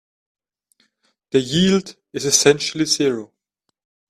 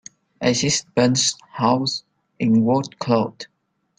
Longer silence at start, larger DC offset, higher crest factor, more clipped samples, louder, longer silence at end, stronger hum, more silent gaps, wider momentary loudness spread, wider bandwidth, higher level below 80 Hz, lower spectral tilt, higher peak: first, 1.35 s vs 0.4 s; neither; about the same, 20 dB vs 18 dB; neither; about the same, -18 LUFS vs -20 LUFS; first, 0.85 s vs 0.55 s; neither; neither; about the same, 11 LU vs 11 LU; first, 14.5 kHz vs 9.6 kHz; about the same, -56 dBFS vs -60 dBFS; about the same, -3.5 dB/octave vs -4 dB/octave; first, 0 dBFS vs -4 dBFS